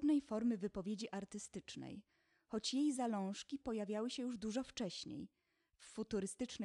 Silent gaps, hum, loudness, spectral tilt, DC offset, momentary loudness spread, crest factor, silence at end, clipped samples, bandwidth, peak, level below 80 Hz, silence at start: none; none; -43 LUFS; -4.5 dB/octave; under 0.1%; 14 LU; 14 dB; 0 s; under 0.1%; 11.5 kHz; -28 dBFS; -72 dBFS; 0 s